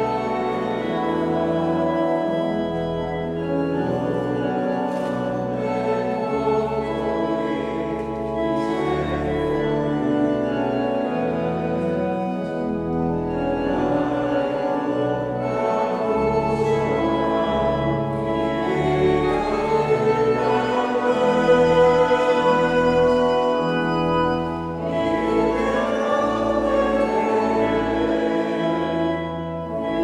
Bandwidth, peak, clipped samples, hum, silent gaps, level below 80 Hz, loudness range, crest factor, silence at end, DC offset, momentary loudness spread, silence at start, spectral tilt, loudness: 10.5 kHz; -4 dBFS; under 0.1%; none; none; -42 dBFS; 5 LU; 16 dB; 0 s; under 0.1%; 7 LU; 0 s; -7 dB/octave; -21 LUFS